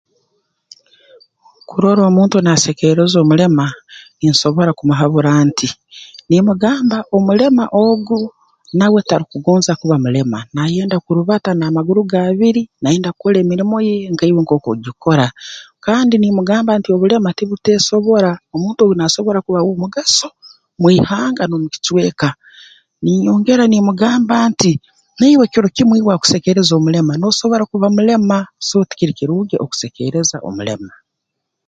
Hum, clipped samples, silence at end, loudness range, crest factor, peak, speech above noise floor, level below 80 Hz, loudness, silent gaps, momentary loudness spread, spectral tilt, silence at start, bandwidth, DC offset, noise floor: none; under 0.1%; 0.8 s; 3 LU; 14 dB; 0 dBFS; 63 dB; -52 dBFS; -14 LUFS; none; 8 LU; -5.5 dB/octave; 1.7 s; 9.2 kHz; under 0.1%; -76 dBFS